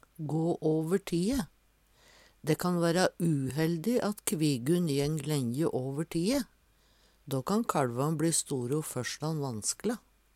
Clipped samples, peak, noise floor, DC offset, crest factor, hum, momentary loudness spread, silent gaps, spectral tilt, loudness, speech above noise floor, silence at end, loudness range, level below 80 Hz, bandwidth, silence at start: under 0.1%; -12 dBFS; -66 dBFS; under 0.1%; 18 dB; none; 7 LU; none; -5.5 dB/octave; -31 LUFS; 35 dB; 0.35 s; 3 LU; -60 dBFS; 16.5 kHz; 0.2 s